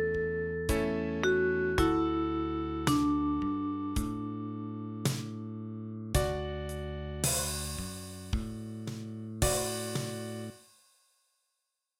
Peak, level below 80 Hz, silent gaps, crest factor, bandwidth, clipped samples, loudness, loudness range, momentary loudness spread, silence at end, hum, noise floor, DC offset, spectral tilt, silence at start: -10 dBFS; -44 dBFS; none; 24 dB; 16.5 kHz; under 0.1%; -33 LUFS; 6 LU; 12 LU; 1.4 s; none; -84 dBFS; under 0.1%; -4.5 dB/octave; 0 s